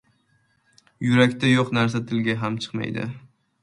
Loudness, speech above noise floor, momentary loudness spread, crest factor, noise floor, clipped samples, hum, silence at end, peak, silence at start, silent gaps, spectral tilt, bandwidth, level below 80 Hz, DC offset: -22 LUFS; 44 dB; 12 LU; 22 dB; -65 dBFS; under 0.1%; none; 0.45 s; -2 dBFS; 1 s; none; -6 dB/octave; 11 kHz; -60 dBFS; under 0.1%